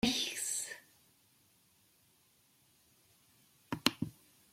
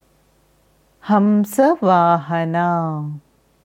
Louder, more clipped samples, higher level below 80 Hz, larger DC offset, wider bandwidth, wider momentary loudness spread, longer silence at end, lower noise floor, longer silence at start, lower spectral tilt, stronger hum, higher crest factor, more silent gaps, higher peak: second, -36 LUFS vs -17 LUFS; neither; about the same, -68 dBFS vs -64 dBFS; neither; about the same, 16.5 kHz vs 16.5 kHz; second, 12 LU vs 15 LU; about the same, 0.4 s vs 0.45 s; first, -70 dBFS vs -58 dBFS; second, 0.05 s vs 1.05 s; second, -2 dB/octave vs -7.5 dB/octave; neither; first, 32 dB vs 18 dB; neither; second, -10 dBFS vs -2 dBFS